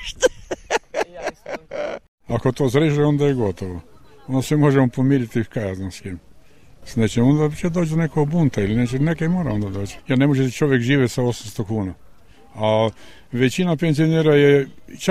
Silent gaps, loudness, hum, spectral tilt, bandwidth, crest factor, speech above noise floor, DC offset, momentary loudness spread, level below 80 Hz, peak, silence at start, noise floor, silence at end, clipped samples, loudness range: 2.08-2.18 s; -20 LUFS; none; -6.5 dB/octave; 14.5 kHz; 16 dB; 31 dB; 0.5%; 14 LU; -46 dBFS; -4 dBFS; 0 s; -50 dBFS; 0 s; under 0.1%; 3 LU